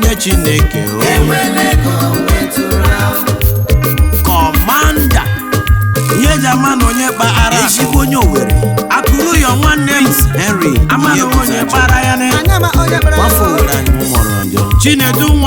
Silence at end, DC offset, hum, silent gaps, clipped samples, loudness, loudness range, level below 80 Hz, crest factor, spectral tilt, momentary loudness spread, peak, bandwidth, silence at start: 0 s; under 0.1%; none; none; under 0.1%; -10 LUFS; 1 LU; -16 dBFS; 10 dB; -4.5 dB/octave; 3 LU; 0 dBFS; over 20 kHz; 0 s